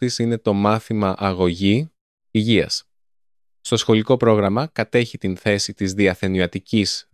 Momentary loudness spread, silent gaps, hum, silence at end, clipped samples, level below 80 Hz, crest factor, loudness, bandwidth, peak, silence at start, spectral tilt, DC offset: 7 LU; 2.01-2.18 s; none; 0.1 s; under 0.1%; -44 dBFS; 18 dB; -20 LUFS; 13.5 kHz; -2 dBFS; 0 s; -5.5 dB/octave; under 0.1%